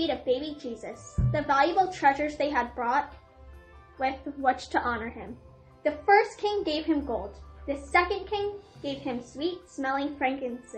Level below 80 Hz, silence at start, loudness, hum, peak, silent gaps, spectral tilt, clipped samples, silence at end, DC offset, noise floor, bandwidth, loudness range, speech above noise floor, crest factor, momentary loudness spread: -46 dBFS; 0 s; -28 LUFS; none; -8 dBFS; none; -5.5 dB/octave; under 0.1%; 0 s; under 0.1%; -50 dBFS; 8.8 kHz; 3 LU; 22 dB; 20 dB; 15 LU